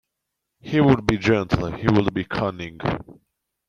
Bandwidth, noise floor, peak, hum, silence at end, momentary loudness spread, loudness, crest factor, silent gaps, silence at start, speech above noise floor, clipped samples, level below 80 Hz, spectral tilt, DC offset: 10.5 kHz; -80 dBFS; -2 dBFS; none; 0.55 s; 10 LU; -22 LUFS; 20 dB; none; 0.65 s; 60 dB; under 0.1%; -44 dBFS; -7.5 dB/octave; under 0.1%